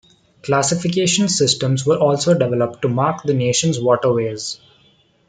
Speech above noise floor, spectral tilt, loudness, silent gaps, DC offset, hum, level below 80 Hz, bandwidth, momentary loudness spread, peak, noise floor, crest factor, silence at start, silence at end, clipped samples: 39 dB; -4.5 dB/octave; -17 LUFS; none; under 0.1%; none; -58 dBFS; 9.6 kHz; 7 LU; -2 dBFS; -56 dBFS; 16 dB; 0.45 s; 0.75 s; under 0.1%